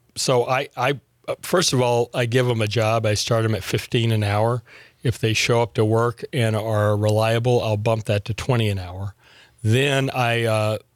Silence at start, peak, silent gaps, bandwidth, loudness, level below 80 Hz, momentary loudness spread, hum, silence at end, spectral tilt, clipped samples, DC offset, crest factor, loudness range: 0.15 s; -8 dBFS; none; 15.5 kHz; -21 LUFS; -54 dBFS; 8 LU; none; 0.15 s; -5 dB/octave; under 0.1%; under 0.1%; 14 dB; 2 LU